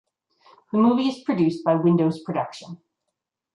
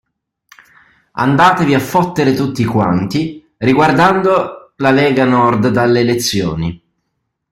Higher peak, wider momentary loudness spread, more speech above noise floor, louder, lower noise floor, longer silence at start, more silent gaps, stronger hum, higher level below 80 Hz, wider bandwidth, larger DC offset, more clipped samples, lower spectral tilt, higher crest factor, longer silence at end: second, -6 dBFS vs 0 dBFS; first, 13 LU vs 9 LU; about the same, 60 dB vs 59 dB; second, -22 LUFS vs -13 LUFS; first, -82 dBFS vs -71 dBFS; second, 0.75 s vs 1.15 s; neither; neither; second, -70 dBFS vs -46 dBFS; second, 10.5 kHz vs 16.5 kHz; neither; neither; first, -8 dB/octave vs -6 dB/octave; about the same, 16 dB vs 14 dB; about the same, 0.8 s vs 0.75 s